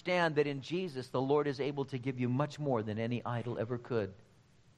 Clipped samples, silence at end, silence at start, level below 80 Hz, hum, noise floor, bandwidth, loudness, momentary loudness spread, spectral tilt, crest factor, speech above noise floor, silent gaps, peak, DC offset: under 0.1%; 0.55 s; 0.05 s; -72 dBFS; none; -64 dBFS; 10.5 kHz; -35 LUFS; 7 LU; -7 dB/octave; 18 dB; 30 dB; none; -16 dBFS; under 0.1%